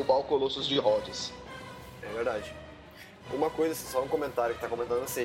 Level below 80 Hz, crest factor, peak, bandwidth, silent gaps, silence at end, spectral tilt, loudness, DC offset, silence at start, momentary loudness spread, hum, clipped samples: -58 dBFS; 18 dB; -12 dBFS; 16.5 kHz; none; 0 s; -4 dB/octave; -30 LUFS; under 0.1%; 0 s; 19 LU; none; under 0.1%